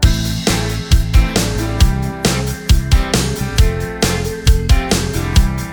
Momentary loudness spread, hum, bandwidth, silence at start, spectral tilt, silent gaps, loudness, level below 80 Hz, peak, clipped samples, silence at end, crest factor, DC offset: 3 LU; none; over 20 kHz; 0 s; -4.5 dB/octave; none; -16 LUFS; -16 dBFS; 0 dBFS; under 0.1%; 0 s; 14 dB; under 0.1%